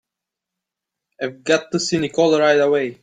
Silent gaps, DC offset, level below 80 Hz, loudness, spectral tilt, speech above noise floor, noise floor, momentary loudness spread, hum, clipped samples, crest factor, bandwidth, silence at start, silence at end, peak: none; under 0.1%; -62 dBFS; -18 LUFS; -4 dB/octave; 67 dB; -84 dBFS; 13 LU; none; under 0.1%; 18 dB; 9.4 kHz; 1.2 s; 0.1 s; -2 dBFS